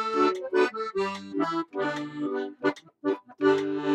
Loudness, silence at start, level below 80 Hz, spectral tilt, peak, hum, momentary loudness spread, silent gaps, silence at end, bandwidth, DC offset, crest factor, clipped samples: -28 LUFS; 0 s; -72 dBFS; -5.5 dB/octave; -10 dBFS; none; 7 LU; none; 0 s; 8.8 kHz; under 0.1%; 16 dB; under 0.1%